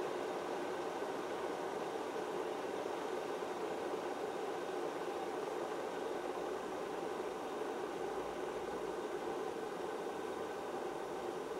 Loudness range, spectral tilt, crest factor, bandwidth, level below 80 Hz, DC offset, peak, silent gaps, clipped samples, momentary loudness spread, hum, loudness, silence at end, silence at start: 1 LU; -4 dB/octave; 14 dB; 16 kHz; -74 dBFS; under 0.1%; -26 dBFS; none; under 0.1%; 2 LU; none; -42 LUFS; 0 s; 0 s